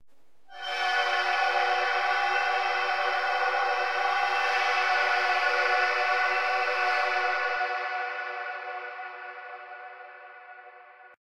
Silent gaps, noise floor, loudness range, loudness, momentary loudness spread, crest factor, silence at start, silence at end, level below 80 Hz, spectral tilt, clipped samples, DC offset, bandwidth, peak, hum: none; -64 dBFS; 9 LU; -26 LUFS; 17 LU; 16 dB; 0.5 s; 0.2 s; -80 dBFS; 0 dB/octave; under 0.1%; under 0.1%; 13.5 kHz; -12 dBFS; none